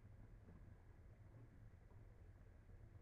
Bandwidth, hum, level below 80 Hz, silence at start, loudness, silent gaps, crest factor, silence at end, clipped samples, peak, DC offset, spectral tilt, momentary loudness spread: 4.8 kHz; none; -66 dBFS; 0 s; -66 LUFS; none; 12 dB; 0 s; under 0.1%; -50 dBFS; under 0.1%; -8.5 dB/octave; 2 LU